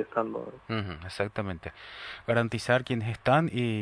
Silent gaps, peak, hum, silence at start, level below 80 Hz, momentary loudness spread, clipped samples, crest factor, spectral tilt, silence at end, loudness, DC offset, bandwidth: none; -10 dBFS; none; 0 s; -56 dBFS; 15 LU; under 0.1%; 20 dB; -6.5 dB/octave; 0 s; -29 LUFS; under 0.1%; 11 kHz